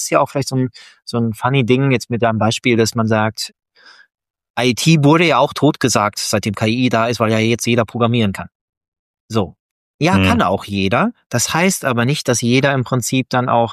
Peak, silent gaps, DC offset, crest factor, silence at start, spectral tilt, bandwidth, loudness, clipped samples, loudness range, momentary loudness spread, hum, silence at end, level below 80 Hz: 0 dBFS; 4.50-4.54 s, 8.55-8.81 s, 8.88-8.92 s, 8.99-9.14 s, 9.20-9.29 s, 9.59-9.99 s, 11.26-11.30 s; under 0.1%; 16 dB; 0 s; -5 dB/octave; 14.5 kHz; -16 LUFS; under 0.1%; 3 LU; 8 LU; none; 0 s; -52 dBFS